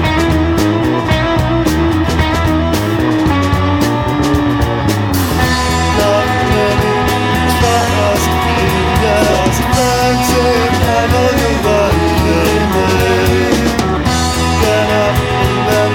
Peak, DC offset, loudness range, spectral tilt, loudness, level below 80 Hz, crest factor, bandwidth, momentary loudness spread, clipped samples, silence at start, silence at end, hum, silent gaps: 0 dBFS; 0.6%; 1 LU; -5 dB/octave; -12 LUFS; -22 dBFS; 10 dB; over 20 kHz; 2 LU; under 0.1%; 0 s; 0 s; none; none